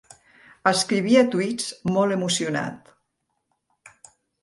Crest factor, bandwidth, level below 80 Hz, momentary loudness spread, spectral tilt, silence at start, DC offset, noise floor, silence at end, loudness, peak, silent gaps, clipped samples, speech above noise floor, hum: 22 dB; 11.5 kHz; -64 dBFS; 9 LU; -4 dB/octave; 0.65 s; under 0.1%; -76 dBFS; 1.65 s; -22 LUFS; -4 dBFS; none; under 0.1%; 54 dB; none